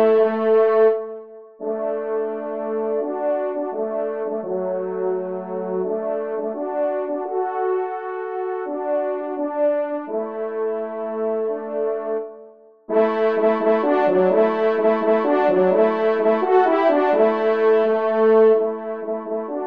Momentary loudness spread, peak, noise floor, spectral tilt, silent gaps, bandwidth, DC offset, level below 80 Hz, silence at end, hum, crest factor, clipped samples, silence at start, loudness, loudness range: 10 LU; -4 dBFS; -46 dBFS; -8.5 dB/octave; none; 5.2 kHz; 0.1%; -74 dBFS; 0 s; none; 16 dB; under 0.1%; 0 s; -21 LUFS; 7 LU